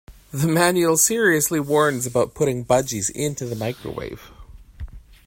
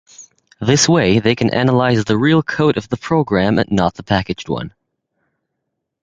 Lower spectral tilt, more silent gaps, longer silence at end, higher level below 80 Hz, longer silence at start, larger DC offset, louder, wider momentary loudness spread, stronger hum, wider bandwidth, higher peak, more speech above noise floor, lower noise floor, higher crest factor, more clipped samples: about the same, -4 dB/octave vs -5 dB/octave; neither; second, 0.3 s vs 1.35 s; about the same, -46 dBFS vs -42 dBFS; about the same, 0.1 s vs 0.2 s; neither; second, -20 LUFS vs -16 LUFS; first, 21 LU vs 10 LU; neither; first, 16.5 kHz vs 9.4 kHz; about the same, -2 dBFS vs 0 dBFS; second, 20 dB vs 61 dB; second, -41 dBFS vs -76 dBFS; about the same, 20 dB vs 16 dB; neither